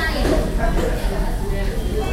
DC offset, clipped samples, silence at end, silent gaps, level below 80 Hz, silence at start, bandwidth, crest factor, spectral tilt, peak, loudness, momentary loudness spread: under 0.1%; under 0.1%; 0 s; none; -22 dBFS; 0 s; 16 kHz; 14 dB; -5.5 dB/octave; -6 dBFS; -22 LUFS; 5 LU